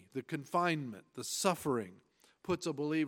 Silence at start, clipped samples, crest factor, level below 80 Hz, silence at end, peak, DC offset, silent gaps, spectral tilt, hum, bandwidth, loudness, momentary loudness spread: 0.15 s; under 0.1%; 20 dB; -72 dBFS; 0 s; -16 dBFS; under 0.1%; none; -4.5 dB/octave; none; 17 kHz; -36 LUFS; 12 LU